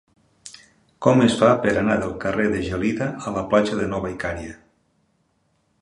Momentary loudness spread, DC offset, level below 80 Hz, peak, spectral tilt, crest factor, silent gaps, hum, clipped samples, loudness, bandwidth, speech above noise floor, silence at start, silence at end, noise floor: 17 LU; under 0.1%; -46 dBFS; -2 dBFS; -6 dB/octave; 22 dB; none; none; under 0.1%; -21 LUFS; 11.5 kHz; 46 dB; 0.45 s; 1.25 s; -67 dBFS